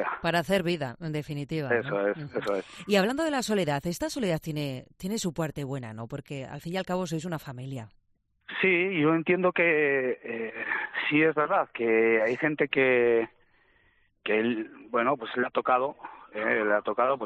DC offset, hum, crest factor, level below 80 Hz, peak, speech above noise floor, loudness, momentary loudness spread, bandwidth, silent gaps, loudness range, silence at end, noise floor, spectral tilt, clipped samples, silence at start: under 0.1%; none; 18 dB; -62 dBFS; -10 dBFS; 42 dB; -27 LUFS; 14 LU; 14 kHz; none; 8 LU; 0 s; -69 dBFS; -5.5 dB/octave; under 0.1%; 0 s